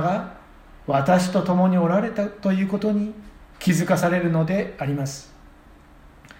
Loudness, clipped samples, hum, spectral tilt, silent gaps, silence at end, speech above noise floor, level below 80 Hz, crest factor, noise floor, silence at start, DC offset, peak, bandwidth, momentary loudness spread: -22 LUFS; under 0.1%; none; -6.5 dB/octave; none; 1.15 s; 27 dB; -50 dBFS; 18 dB; -49 dBFS; 0 s; under 0.1%; -6 dBFS; 16.5 kHz; 12 LU